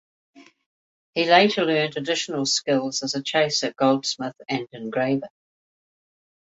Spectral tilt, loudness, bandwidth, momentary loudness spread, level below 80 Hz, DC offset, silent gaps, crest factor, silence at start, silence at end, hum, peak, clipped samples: -3.5 dB/octave; -22 LUFS; 8.2 kHz; 12 LU; -70 dBFS; under 0.1%; 0.66-1.13 s; 22 dB; 0.35 s; 1.2 s; none; -2 dBFS; under 0.1%